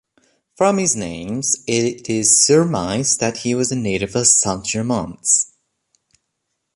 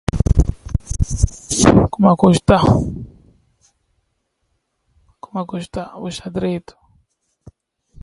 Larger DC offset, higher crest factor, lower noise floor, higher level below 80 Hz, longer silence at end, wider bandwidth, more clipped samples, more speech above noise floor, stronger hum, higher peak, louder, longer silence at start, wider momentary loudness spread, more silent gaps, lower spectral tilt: neither; about the same, 18 dB vs 18 dB; first, -75 dBFS vs -70 dBFS; second, -50 dBFS vs -26 dBFS; about the same, 1.3 s vs 1.4 s; about the same, 11.5 kHz vs 11.5 kHz; neither; first, 57 dB vs 53 dB; neither; about the same, 0 dBFS vs 0 dBFS; about the same, -17 LUFS vs -17 LUFS; first, 0.6 s vs 0.15 s; second, 9 LU vs 16 LU; neither; second, -3 dB/octave vs -6 dB/octave